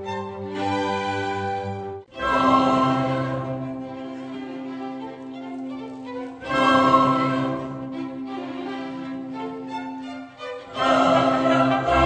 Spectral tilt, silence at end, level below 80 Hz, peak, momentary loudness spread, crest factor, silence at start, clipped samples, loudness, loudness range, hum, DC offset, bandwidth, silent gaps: -6 dB/octave; 0 s; -48 dBFS; -4 dBFS; 16 LU; 20 dB; 0 s; under 0.1%; -23 LUFS; 8 LU; none; under 0.1%; 9.2 kHz; none